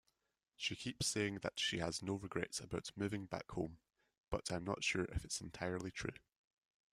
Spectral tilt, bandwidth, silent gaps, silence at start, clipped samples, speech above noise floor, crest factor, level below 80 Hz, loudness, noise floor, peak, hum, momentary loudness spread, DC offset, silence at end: -3.5 dB/octave; 15.5 kHz; 4.17-4.24 s; 0.6 s; under 0.1%; 42 dB; 22 dB; -60 dBFS; -42 LUFS; -85 dBFS; -22 dBFS; none; 8 LU; under 0.1%; 0.75 s